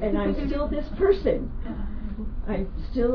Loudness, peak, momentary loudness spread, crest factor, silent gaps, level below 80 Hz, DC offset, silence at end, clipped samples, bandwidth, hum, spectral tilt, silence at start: -27 LUFS; -8 dBFS; 12 LU; 16 dB; none; -30 dBFS; under 0.1%; 0 s; under 0.1%; 5.4 kHz; none; -9.5 dB/octave; 0 s